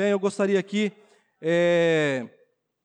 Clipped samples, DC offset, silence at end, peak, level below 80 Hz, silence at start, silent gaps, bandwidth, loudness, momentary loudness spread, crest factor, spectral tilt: under 0.1%; under 0.1%; 0.55 s; -12 dBFS; -80 dBFS; 0 s; none; 9.8 kHz; -24 LUFS; 11 LU; 12 dB; -5.5 dB/octave